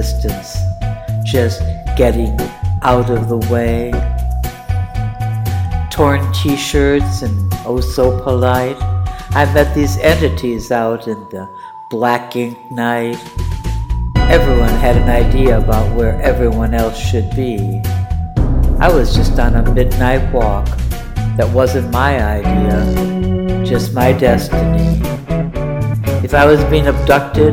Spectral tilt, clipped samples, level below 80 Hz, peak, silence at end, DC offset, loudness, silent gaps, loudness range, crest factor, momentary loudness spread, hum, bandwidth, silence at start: -6.5 dB/octave; under 0.1%; -18 dBFS; 0 dBFS; 0 s; under 0.1%; -15 LUFS; none; 3 LU; 14 dB; 9 LU; none; 16.5 kHz; 0 s